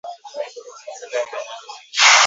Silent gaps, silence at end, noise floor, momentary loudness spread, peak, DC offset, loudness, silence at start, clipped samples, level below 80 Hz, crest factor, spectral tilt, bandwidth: none; 0 s; -36 dBFS; 22 LU; 0 dBFS; under 0.1%; -20 LUFS; 0.05 s; under 0.1%; -86 dBFS; 20 dB; 4.5 dB/octave; 8 kHz